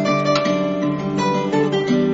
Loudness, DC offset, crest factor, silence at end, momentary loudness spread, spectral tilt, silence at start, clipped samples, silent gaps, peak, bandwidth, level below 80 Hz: -19 LUFS; under 0.1%; 14 dB; 0 s; 4 LU; -5 dB/octave; 0 s; under 0.1%; none; -6 dBFS; 8 kHz; -54 dBFS